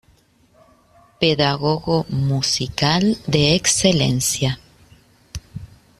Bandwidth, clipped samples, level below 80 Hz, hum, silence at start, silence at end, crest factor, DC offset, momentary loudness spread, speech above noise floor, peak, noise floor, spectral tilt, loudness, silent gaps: 13.5 kHz; under 0.1%; -44 dBFS; none; 1.2 s; 0.35 s; 20 dB; under 0.1%; 20 LU; 38 dB; -2 dBFS; -56 dBFS; -4 dB/octave; -18 LUFS; none